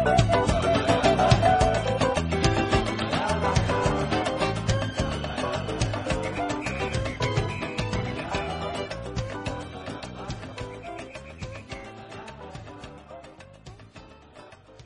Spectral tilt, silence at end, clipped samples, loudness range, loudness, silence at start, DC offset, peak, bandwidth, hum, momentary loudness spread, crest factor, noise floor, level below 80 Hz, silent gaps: -5.5 dB/octave; 0 s; under 0.1%; 17 LU; -26 LUFS; 0 s; under 0.1%; -4 dBFS; 10.5 kHz; none; 20 LU; 22 dB; -49 dBFS; -38 dBFS; none